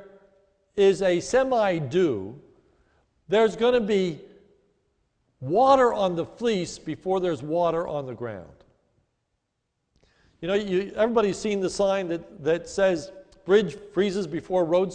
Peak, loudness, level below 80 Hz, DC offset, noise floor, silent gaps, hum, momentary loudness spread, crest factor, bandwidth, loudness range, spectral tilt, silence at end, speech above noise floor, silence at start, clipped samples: -6 dBFS; -24 LUFS; -56 dBFS; under 0.1%; -78 dBFS; none; none; 13 LU; 18 dB; 9.6 kHz; 6 LU; -5.5 dB/octave; 0 s; 54 dB; 0 s; under 0.1%